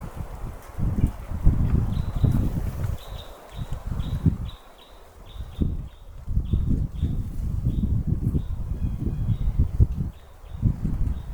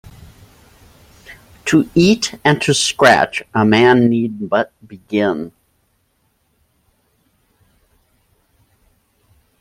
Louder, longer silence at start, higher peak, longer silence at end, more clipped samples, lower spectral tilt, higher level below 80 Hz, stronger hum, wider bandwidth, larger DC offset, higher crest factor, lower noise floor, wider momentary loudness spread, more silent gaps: second, -27 LUFS vs -15 LUFS; second, 0 s vs 1.3 s; second, -4 dBFS vs 0 dBFS; second, 0 s vs 4.1 s; neither; first, -8.5 dB/octave vs -4.5 dB/octave; first, -28 dBFS vs -52 dBFS; neither; first, over 20 kHz vs 16 kHz; neither; about the same, 22 dB vs 18 dB; second, -47 dBFS vs -63 dBFS; first, 16 LU vs 11 LU; neither